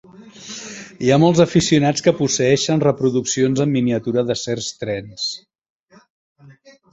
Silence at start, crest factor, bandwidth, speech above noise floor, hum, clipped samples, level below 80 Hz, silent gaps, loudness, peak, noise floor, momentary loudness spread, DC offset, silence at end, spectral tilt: 0.2 s; 18 dB; 8.2 kHz; 30 dB; none; under 0.1%; -52 dBFS; 5.70-5.87 s, 6.10-6.35 s; -18 LUFS; -2 dBFS; -47 dBFS; 17 LU; under 0.1%; 0.4 s; -5 dB/octave